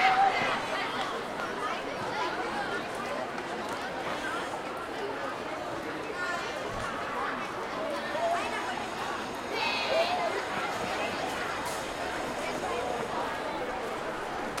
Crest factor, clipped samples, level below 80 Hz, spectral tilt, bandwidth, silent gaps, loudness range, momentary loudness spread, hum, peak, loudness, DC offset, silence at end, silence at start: 20 dB; under 0.1%; -58 dBFS; -3 dB/octave; 16.5 kHz; none; 4 LU; 6 LU; none; -12 dBFS; -32 LUFS; under 0.1%; 0 s; 0 s